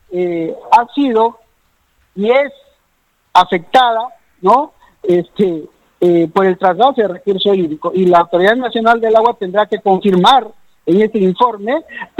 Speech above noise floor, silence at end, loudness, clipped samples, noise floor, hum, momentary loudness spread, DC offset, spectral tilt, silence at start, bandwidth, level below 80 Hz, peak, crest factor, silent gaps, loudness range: 48 dB; 0.15 s; -13 LUFS; under 0.1%; -60 dBFS; none; 9 LU; under 0.1%; -6.5 dB/octave; 0.1 s; 12 kHz; -56 dBFS; 0 dBFS; 14 dB; none; 3 LU